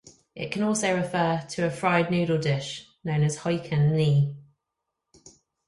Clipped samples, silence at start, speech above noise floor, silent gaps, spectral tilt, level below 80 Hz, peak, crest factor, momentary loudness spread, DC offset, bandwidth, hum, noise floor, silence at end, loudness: under 0.1%; 0.35 s; 59 dB; none; -6 dB/octave; -60 dBFS; -8 dBFS; 18 dB; 12 LU; under 0.1%; 11.5 kHz; none; -83 dBFS; 0.4 s; -25 LUFS